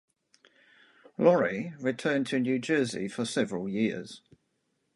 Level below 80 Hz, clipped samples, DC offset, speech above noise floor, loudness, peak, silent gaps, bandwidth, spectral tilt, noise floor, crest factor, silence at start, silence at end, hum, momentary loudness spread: -72 dBFS; under 0.1%; under 0.1%; 48 dB; -29 LUFS; -8 dBFS; none; 11.5 kHz; -5.5 dB/octave; -77 dBFS; 22 dB; 1.2 s; 0.8 s; none; 14 LU